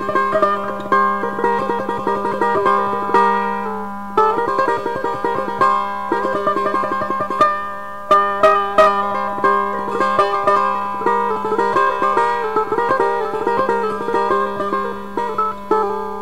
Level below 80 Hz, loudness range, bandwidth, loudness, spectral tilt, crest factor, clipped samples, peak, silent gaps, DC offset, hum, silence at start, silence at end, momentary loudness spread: -50 dBFS; 3 LU; 16 kHz; -18 LUFS; -5.5 dB/octave; 16 dB; under 0.1%; -2 dBFS; none; 2%; none; 0 s; 0 s; 6 LU